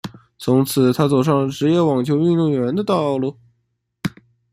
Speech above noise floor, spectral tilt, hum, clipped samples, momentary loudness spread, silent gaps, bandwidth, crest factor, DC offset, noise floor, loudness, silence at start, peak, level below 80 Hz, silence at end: 54 dB; -7 dB/octave; none; under 0.1%; 13 LU; none; 16 kHz; 16 dB; under 0.1%; -71 dBFS; -18 LUFS; 0.05 s; -2 dBFS; -56 dBFS; 0.45 s